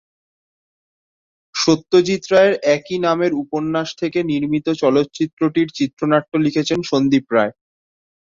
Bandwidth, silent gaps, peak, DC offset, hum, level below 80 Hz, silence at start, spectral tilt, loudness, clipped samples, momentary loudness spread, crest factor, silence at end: 7.6 kHz; 5.33-5.37 s, 5.93-5.97 s; -2 dBFS; under 0.1%; none; -58 dBFS; 1.55 s; -5.5 dB/octave; -18 LUFS; under 0.1%; 7 LU; 16 dB; 0.8 s